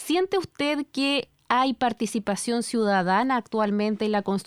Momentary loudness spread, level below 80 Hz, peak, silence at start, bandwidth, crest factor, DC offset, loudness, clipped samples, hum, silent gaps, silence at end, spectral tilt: 5 LU; -64 dBFS; -6 dBFS; 0 s; 15 kHz; 18 dB; under 0.1%; -25 LUFS; under 0.1%; none; none; 0.05 s; -4.5 dB/octave